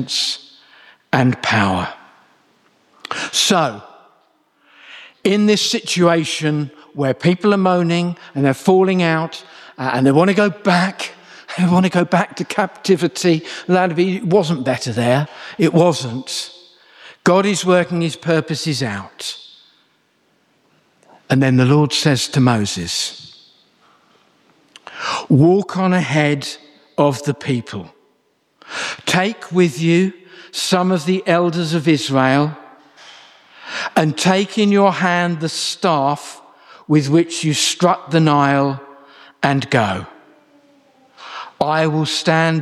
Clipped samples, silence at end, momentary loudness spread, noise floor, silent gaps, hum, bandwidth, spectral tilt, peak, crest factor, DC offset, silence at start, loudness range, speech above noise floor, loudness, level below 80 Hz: under 0.1%; 0 s; 14 LU; -62 dBFS; none; none; 14 kHz; -5 dB/octave; -2 dBFS; 16 dB; under 0.1%; 0 s; 5 LU; 46 dB; -17 LUFS; -60 dBFS